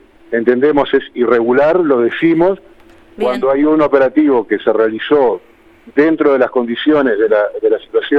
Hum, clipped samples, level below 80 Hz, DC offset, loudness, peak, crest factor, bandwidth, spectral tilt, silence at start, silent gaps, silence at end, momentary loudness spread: none; under 0.1%; -48 dBFS; under 0.1%; -13 LUFS; 0 dBFS; 12 dB; 5.2 kHz; -7.5 dB/octave; 0.3 s; none; 0 s; 5 LU